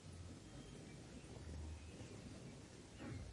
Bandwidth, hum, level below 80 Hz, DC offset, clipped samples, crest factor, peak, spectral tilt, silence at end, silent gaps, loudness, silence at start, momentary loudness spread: 11.5 kHz; none; -62 dBFS; under 0.1%; under 0.1%; 14 dB; -40 dBFS; -5.5 dB/octave; 0 s; none; -55 LUFS; 0 s; 4 LU